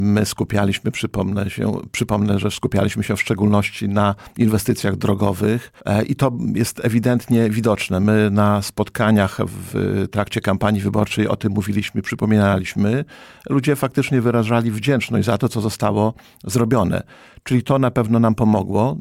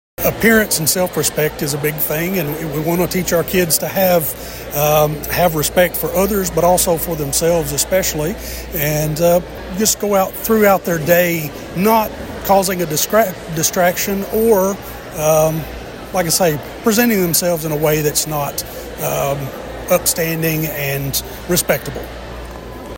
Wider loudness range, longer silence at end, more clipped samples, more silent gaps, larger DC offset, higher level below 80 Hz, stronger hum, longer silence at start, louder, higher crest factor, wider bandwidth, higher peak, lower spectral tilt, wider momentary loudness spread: about the same, 2 LU vs 3 LU; about the same, 0 s vs 0 s; neither; neither; neither; second, -46 dBFS vs -36 dBFS; neither; second, 0 s vs 0.2 s; second, -19 LUFS vs -16 LUFS; about the same, 14 dB vs 16 dB; about the same, 16.5 kHz vs 16.5 kHz; second, -4 dBFS vs 0 dBFS; first, -6.5 dB/octave vs -4 dB/octave; second, 6 LU vs 10 LU